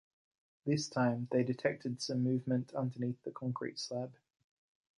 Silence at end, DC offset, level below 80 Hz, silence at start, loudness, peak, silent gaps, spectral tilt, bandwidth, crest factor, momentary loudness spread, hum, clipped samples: 0.85 s; under 0.1%; -78 dBFS; 0.65 s; -36 LUFS; -18 dBFS; none; -6 dB/octave; 11 kHz; 20 dB; 8 LU; none; under 0.1%